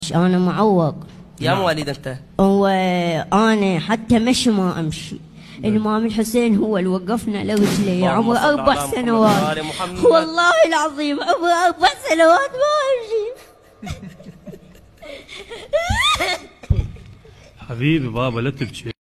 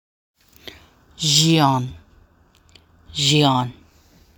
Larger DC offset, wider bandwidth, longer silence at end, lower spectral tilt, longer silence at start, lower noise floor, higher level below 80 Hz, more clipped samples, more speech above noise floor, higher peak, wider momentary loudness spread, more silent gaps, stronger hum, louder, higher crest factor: neither; second, 14 kHz vs 19 kHz; second, 0.1 s vs 0.65 s; first, -5.5 dB/octave vs -4 dB/octave; second, 0 s vs 1.2 s; second, -44 dBFS vs -55 dBFS; first, -38 dBFS vs -52 dBFS; neither; second, 26 dB vs 38 dB; about the same, -2 dBFS vs -2 dBFS; second, 18 LU vs 25 LU; neither; neither; about the same, -18 LUFS vs -17 LUFS; about the same, 18 dB vs 20 dB